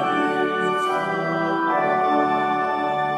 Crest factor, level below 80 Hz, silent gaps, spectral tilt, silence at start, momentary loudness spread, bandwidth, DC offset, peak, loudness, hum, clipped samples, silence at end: 14 dB; -64 dBFS; none; -6 dB/octave; 0 s; 3 LU; 13 kHz; under 0.1%; -8 dBFS; -21 LUFS; none; under 0.1%; 0 s